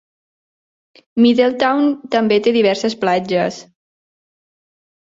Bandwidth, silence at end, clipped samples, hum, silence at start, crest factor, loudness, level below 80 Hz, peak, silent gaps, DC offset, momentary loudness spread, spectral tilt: 7.8 kHz; 1.45 s; under 0.1%; none; 1.15 s; 16 dB; -16 LUFS; -62 dBFS; -2 dBFS; none; under 0.1%; 7 LU; -5.5 dB/octave